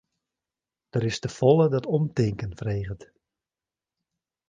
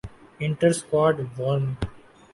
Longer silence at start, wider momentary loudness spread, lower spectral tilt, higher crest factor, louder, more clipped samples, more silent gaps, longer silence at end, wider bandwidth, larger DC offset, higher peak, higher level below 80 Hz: first, 0.95 s vs 0.05 s; about the same, 12 LU vs 12 LU; about the same, -7 dB/octave vs -6 dB/octave; about the same, 22 dB vs 18 dB; about the same, -25 LUFS vs -24 LUFS; neither; neither; first, 1.45 s vs 0.35 s; second, 9.4 kHz vs 11.5 kHz; neither; about the same, -6 dBFS vs -8 dBFS; second, -52 dBFS vs -46 dBFS